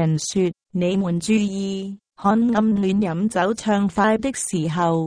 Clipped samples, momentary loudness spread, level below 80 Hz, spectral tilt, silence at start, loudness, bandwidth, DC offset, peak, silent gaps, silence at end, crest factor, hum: under 0.1%; 6 LU; -52 dBFS; -5.5 dB/octave; 0 s; -21 LUFS; 10.5 kHz; under 0.1%; -6 dBFS; none; 0 s; 16 dB; none